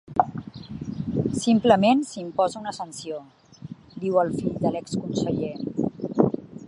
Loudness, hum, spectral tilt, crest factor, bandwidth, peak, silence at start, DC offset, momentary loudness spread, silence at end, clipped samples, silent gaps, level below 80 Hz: -25 LUFS; none; -6 dB/octave; 22 dB; 11.5 kHz; -2 dBFS; 0.1 s; under 0.1%; 19 LU; 0 s; under 0.1%; none; -54 dBFS